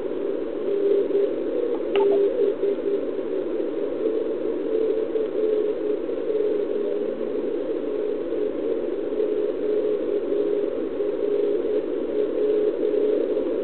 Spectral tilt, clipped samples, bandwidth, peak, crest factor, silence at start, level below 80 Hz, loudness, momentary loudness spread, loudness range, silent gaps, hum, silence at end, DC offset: -10 dB/octave; under 0.1%; 4.3 kHz; -6 dBFS; 16 dB; 0 s; -58 dBFS; -24 LUFS; 5 LU; 3 LU; none; none; 0 s; 1%